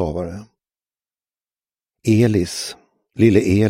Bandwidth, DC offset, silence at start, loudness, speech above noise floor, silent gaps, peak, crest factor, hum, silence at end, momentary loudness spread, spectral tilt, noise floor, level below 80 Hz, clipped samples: 16 kHz; under 0.1%; 0 s; -18 LUFS; over 74 dB; none; -2 dBFS; 18 dB; none; 0 s; 17 LU; -6.5 dB/octave; under -90 dBFS; -44 dBFS; under 0.1%